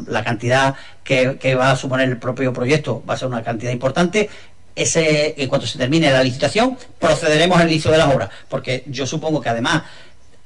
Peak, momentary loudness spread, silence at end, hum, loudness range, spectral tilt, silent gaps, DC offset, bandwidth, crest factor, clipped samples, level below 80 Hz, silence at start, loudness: -2 dBFS; 9 LU; 0.5 s; none; 3 LU; -4.5 dB/octave; none; 1%; 11 kHz; 16 dB; under 0.1%; -46 dBFS; 0 s; -18 LUFS